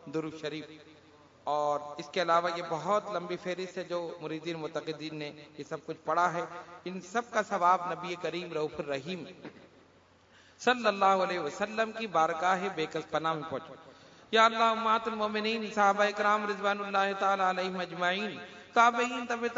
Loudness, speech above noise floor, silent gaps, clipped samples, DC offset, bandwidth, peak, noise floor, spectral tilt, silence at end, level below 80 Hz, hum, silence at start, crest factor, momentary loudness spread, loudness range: -30 LUFS; 31 dB; none; under 0.1%; under 0.1%; 7.4 kHz; -10 dBFS; -61 dBFS; -2 dB/octave; 0 s; -76 dBFS; none; 0.05 s; 22 dB; 15 LU; 7 LU